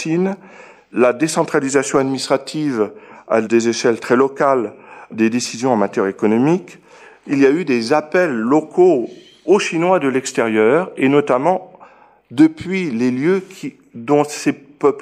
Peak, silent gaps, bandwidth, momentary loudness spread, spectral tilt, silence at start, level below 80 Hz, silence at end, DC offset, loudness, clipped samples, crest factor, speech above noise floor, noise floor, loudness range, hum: -2 dBFS; none; 13.5 kHz; 8 LU; -5.5 dB/octave; 0 s; -64 dBFS; 0 s; under 0.1%; -17 LUFS; under 0.1%; 14 dB; 30 dB; -46 dBFS; 3 LU; none